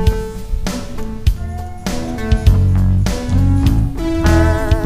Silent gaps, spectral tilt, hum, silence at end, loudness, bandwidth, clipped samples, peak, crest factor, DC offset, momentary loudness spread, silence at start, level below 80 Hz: none; -7 dB/octave; none; 0 s; -17 LUFS; 15.5 kHz; under 0.1%; 0 dBFS; 14 dB; under 0.1%; 12 LU; 0 s; -18 dBFS